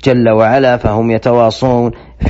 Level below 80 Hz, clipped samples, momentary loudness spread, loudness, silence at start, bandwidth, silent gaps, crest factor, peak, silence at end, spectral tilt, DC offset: -30 dBFS; under 0.1%; 4 LU; -11 LUFS; 0 s; 8 kHz; none; 10 dB; 0 dBFS; 0 s; -6 dB/octave; under 0.1%